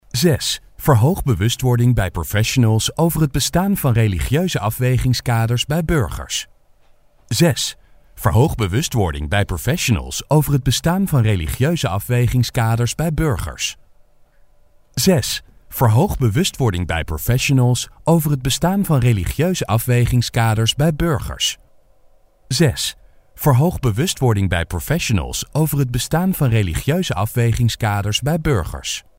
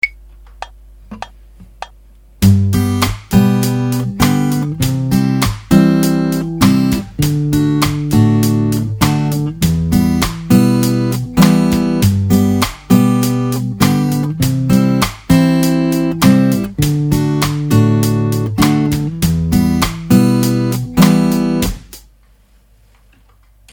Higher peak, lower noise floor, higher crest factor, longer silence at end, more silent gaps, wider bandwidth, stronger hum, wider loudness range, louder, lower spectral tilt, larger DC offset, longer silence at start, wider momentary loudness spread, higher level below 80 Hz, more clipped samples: about the same, 0 dBFS vs 0 dBFS; about the same, -51 dBFS vs -49 dBFS; about the same, 16 dB vs 14 dB; second, 0.2 s vs 1.75 s; neither; second, 16.5 kHz vs over 20 kHz; neither; about the same, 3 LU vs 2 LU; second, -18 LUFS vs -13 LUFS; about the same, -5 dB/octave vs -6 dB/octave; neither; about the same, 0.15 s vs 0.05 s; about the same, 6 LU vs 6 LU; about the same, -32 dBFS vs -32 dBFS; neither